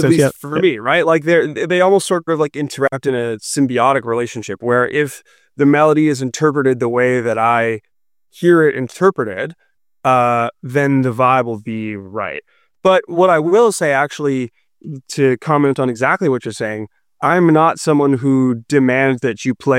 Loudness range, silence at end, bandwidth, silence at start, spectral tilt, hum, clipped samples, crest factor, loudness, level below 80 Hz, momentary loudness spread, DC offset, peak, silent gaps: 2 LU; 0 s; 15.5 kHz; 0 s; -6 dB/octave; none; under 0.1%; 14 dB; -15 LUFS; -60 dBFS; 11 LU; under 0.1%; -2 dBFS; none